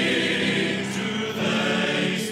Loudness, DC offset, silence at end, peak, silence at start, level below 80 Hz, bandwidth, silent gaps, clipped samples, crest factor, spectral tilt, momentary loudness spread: -23 LUFS; under 0.1%; 0 s; -10 dBFS; 0 s; -68 dBFS; 16 kHz; none; under 0.1%; 14 dB; -4 dB/octave; 5 LU